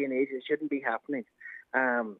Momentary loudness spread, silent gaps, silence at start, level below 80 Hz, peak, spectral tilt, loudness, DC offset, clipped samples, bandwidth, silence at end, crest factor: 12 LU; none; 0 s; -88 dBFS; -12 dBFS; -7.5 dB/octave; -31 LUFS; under 0.1%; under 0.1%; 4.1 kHz; 0 s; 20 dB